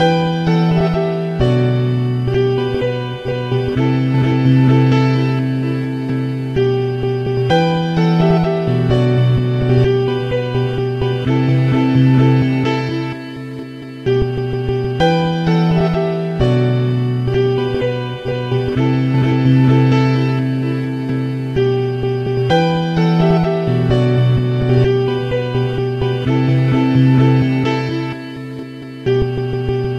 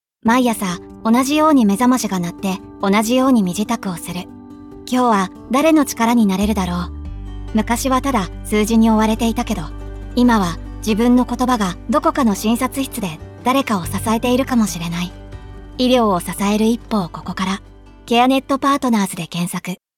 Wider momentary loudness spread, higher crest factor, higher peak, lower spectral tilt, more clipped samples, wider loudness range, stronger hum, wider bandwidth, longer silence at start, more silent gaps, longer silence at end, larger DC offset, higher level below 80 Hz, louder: second, 8 LU vs 12 LU; about the same, 14 dB vs 14 dB; about the same, -2 dBFS vs -2 dBFS; first, -8.5 dB/octave vs -5 dB/octave; neither; about the same, 2 LU vs 3 LU; neither; second, 6.6 kHz vs 18 kHz; second, 0 s vs 0.25 s; neither; second, 0 s vs 0.2 s; neither; about the same, -36 dBFS vs -36 dBFS; about the same, -16 LUFS vs -17 LUFS